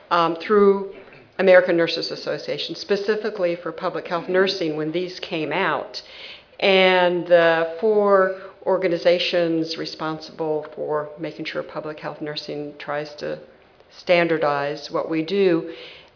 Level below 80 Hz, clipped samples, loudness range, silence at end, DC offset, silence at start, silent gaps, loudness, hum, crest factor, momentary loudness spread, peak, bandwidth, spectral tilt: -66 dBFS; under 0.1%; 10 LU; 0.15 s; under 0.1%; 0.1 s; none; -21 LUFS; none; 20 dB; 15 LU; -2 dBFS; 5.4 kHz; -5.5 dB/octave